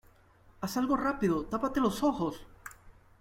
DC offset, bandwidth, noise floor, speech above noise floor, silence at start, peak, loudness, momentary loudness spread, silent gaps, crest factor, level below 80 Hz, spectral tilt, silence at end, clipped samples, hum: under 0.1%; 16.5 kHz; -60 dBFS; 30 dB; 0.6 s; -16 dBFS; -31 LUFS; 19 LU; none; 16 dB; -54 dBFS; -6 dB/octave; 0.3 s; under 0.1%; none